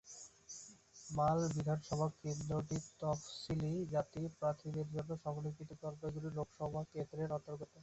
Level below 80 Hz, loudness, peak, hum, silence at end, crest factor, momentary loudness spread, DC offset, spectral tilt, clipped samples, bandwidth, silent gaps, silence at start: -64 dBFS; -41 LUFS; -24 dBFS; none; 0 s; 18 dB; 14 LU; under 0.1%; -6.5 dB/octave; under 0.1%; 8.2 kHz; none; 0.05 s